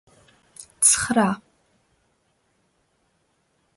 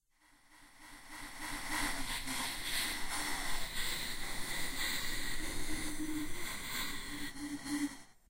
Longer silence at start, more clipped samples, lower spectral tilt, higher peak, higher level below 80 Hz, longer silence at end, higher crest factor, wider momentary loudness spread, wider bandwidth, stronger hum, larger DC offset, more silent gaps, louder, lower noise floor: first, 0.6 s vs 0 s; neither; about the same, -2.5 dB/octave vs -1.5 dB/octave; first, -2 dBFS vs -22 dBFS; second, -58 dBFS vs -46 dBFS; first, 2.4 s vs 0.05 s; first, 24 dB vs 16 dB; first, 28 LU vs 7 LU; second, 12 kHz vs 16 kHz; neither; neither; neither; first, -19 LUFS vs -39 LUFS; about the same, -68 dBFS vs -67 dBFS